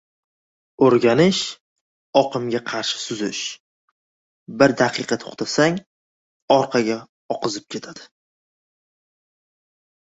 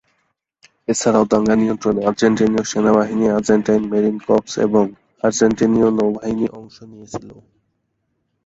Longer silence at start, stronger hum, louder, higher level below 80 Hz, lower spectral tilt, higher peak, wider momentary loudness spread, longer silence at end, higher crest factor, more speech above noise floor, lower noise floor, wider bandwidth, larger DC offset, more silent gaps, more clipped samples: about the same, 0.8 s vs 0.9 s; neither; second, -20 LUFS vs -17 LUFS; second, -62 dBFS vs -50 dBFS; about the same, -4.5 dB/octave vs -5.5 dB/octave; about the same, 0 dBFS vs -2 dBFS; first, 15 LU vs 8 LU; first, 2.15 s vs 1.1 s; first, 22 dB vs 16 dB; first, over 70 dB vs 54 dB; first, under -90 dBFS vs -70 dBFS; about the same, 8 kHz vs 8 kHz; neither; first, 1.60-2.13 s, 3.60-4.46 s, 5.86-6.48 s, 7.09-7.29 s vs none; neither